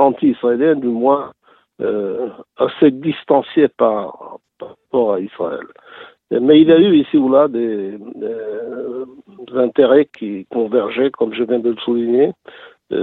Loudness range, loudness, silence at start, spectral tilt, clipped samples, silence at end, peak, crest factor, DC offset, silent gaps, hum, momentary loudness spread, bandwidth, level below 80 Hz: 4 LU; -16 LUFS; 0 s; -9.5 dB/octave; under 0.1%; 0 s; 0 dBFS; 16 dB; under 0.1%; none; none; 16 LU; 4.1 kHz; -62 dBFS